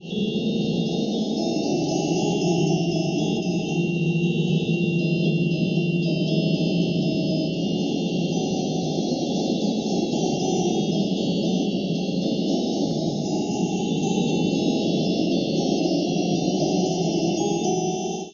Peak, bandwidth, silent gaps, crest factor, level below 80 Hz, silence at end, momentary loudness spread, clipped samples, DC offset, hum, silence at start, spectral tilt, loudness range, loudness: -10 dBFS; 7.2 kHz; none; 14 dB; -58 dBFS; 0 s; 3 LU; under 0.1%; under 0.1%; none; 0 s; -6 dB/octave; 1 LU; -23 LUFS